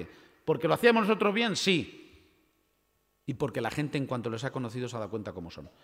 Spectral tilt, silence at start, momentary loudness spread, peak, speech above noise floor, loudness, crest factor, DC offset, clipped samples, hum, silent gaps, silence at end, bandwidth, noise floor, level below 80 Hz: -5 dB/octave; 0 s; 19 LU; -8 dBFS; 44 dB; -29 LUFS; 22 dB; under 0.1%; under 0.1%; none; none; 0.15 s; 16 kHz; -74 dBFS; -64 dBFS